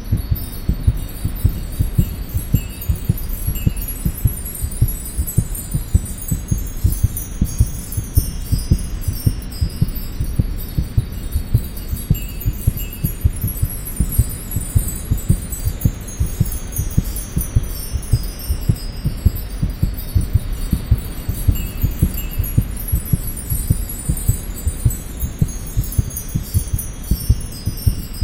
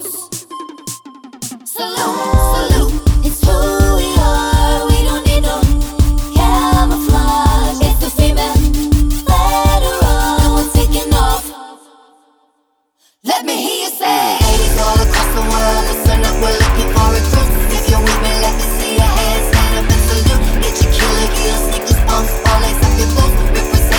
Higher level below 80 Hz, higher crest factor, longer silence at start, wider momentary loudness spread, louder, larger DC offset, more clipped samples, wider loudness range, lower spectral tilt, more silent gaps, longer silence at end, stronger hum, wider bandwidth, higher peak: second, -22 dBFS vs -14 dBFS; first, 18 dB vs 12 dB; about the same, 0 s vs 0 s; about the same, 5 LU vs 5 LU; second, -22 LUFS vs -14 LUFS; neither; neither; second, 1 LU vs 4 LU; about the same, -5.5 dB/octave vs -4.5 dB/octave; neither; about the same, 0 s vs 0 s; neither; second, 17 kHz vs over 20 kHz; about the same, -2 dBFS vs 0 dBFS